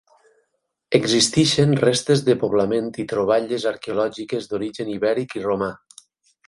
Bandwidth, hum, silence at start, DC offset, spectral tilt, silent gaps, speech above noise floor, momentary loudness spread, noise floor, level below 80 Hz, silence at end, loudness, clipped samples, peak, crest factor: 11.5 kHz; none; 0.9 s; under 0.1%; -4.5 dB/octave; none; 53 dB; 10 LU; -73 dBFS; -56 dBFS; 0.7 s; -21 LUFS; under 0.1%; 0 dBFS; 20 dB